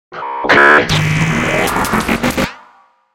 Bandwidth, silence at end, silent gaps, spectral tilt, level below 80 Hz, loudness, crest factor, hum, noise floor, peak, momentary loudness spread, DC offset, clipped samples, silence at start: 17 kHz; 0.55 s; none; -4.5 dB/octave; -34 dBFS; -12 LUFS; 14 dB; none; -48 dBFS; 0 dBFS; 13 LU; under 0.1%; under 0.1%; 0.1 s